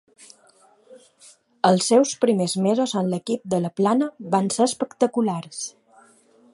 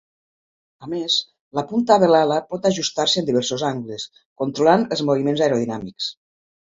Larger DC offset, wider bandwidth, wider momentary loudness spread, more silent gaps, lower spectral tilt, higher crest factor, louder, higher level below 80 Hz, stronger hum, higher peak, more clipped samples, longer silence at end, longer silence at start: neither; first, 11.5 kHz vs 7.8 kHz; second, 8 LU vs 13 LU; second, none vs 1.41-1.51 s, 4.26-4.36 s; about the same, -5 dB/octave vs -4.5 dB/octave; about the same, 20 dB vs 20 dB; about the same, -22 LUFS vs -20 LUFS; second, -70 dBFS vs -62 dBFS; neither; second, -4 dBFS vs 0 dBFS; neither; first, 0.85 s vs 0.55 s; about the same, 0.9 s vs 0.8 s